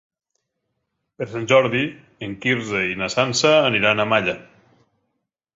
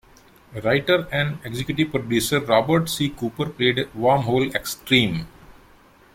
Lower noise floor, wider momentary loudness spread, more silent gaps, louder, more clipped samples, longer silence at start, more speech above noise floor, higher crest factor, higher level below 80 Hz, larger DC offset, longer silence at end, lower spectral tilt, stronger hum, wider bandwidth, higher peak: first, -76 dBFS vs -52 dBFS; first, 16 LU vs 9 LU; neither; about the same, -19 LUFS vs -21 LUFS; neither; first, 1.2 s vs 0.5 s; first, 56 dB vs 30 dB; about the same, 20 dB vs 20 dB; second, -58 dBFS vs -50 dBFS; neither; first, 1.15 s vs 0.65 s; about the same, -4 dB/octave vs -5 dB/octave; neither; second, 8 kHz vs 16.5 kHz; about the same, -2 dBFS vs -2 dBFS